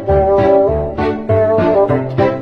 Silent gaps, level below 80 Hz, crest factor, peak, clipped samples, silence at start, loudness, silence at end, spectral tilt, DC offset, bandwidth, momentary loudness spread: none; -30 dBFS; 12 dB; 0 dBFS; under 0.1%; 0 s; -13 LUFS; 0 s; -9.5 dB/octave; under 0.1%; 6.2 kHz; 6 LU